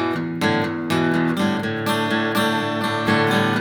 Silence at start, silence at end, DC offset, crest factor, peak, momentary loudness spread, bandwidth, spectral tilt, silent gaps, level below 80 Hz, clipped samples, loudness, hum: 0 s; 0 s; under 0.1%; 16 dB; -4 dBFS; 4 LU; over 20 kHz; -5.5 dB/octave; none; -60 dBFS; under 0.1%; -20 LUFS; none